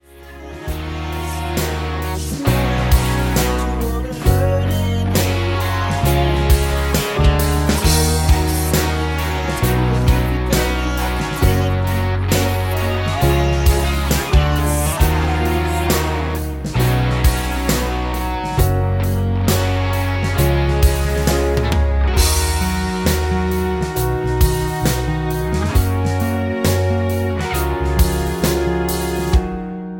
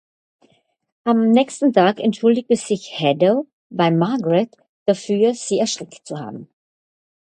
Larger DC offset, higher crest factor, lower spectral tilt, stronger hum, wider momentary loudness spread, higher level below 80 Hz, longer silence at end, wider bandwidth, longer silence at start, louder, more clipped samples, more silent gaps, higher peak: neither; about the same, 16 dB vs 18 dB; about the same, -5.5 dB/octave vs -5.5 dB/octave; neither; second, 5 LU vs 15 LU; first, -20 dBFS vs -68 dBFS; second, 0 s vs 0.9 s; first, 17 kHz vs 9.8 kHz; second, 0.15 s vs 1.05 s; about the same, -18 LUFS vs -18 LUFS; neither; second, none vs 3.53-3.70 s, 4.69-4.86 s; about the same, -2 dBFS vs 0 dBFS